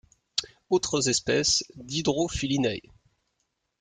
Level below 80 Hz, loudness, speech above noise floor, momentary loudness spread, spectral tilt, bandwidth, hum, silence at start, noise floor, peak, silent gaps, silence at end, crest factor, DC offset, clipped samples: -52 dBFS; -26 LUFS; 52 dB; 9 LU; -3 dB/octave; 10 kHz; none; 0.35 s; -78 dBFS; -8 dBFS; none; 1 s; 22 dB; under 0.1%; under 0.1%